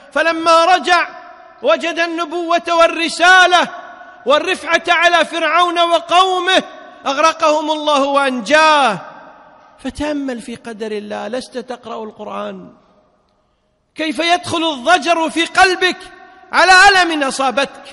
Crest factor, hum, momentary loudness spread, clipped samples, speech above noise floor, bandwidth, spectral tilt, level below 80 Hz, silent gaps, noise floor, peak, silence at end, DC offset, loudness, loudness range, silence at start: 16 dB; none; 18 LU; under 0.1%; 48 dB; 11.5 kHz; -2 dB/octave; -50 dBFS; none; -62 dBFS; 0 dBFS; 0 s; under 0.1%; -13 LUFS; 13 LU; 0.15 s